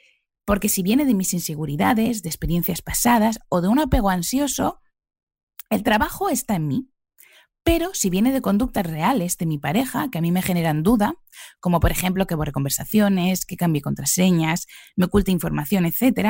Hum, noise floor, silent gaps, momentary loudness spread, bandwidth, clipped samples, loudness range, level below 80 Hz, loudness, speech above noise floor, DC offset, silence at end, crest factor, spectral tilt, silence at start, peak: none; -53 dBFS; 5.23-5.27 s, 5.43-5.47 s; 6 LU; 16.5 kHz; under 0.1%; 2 LU; -36 dBFS; -21 LUFS; 33 dB; under 0.1%; 0 s; 16 dB; -5 dB/octave; 0.45 s; -6 dBFS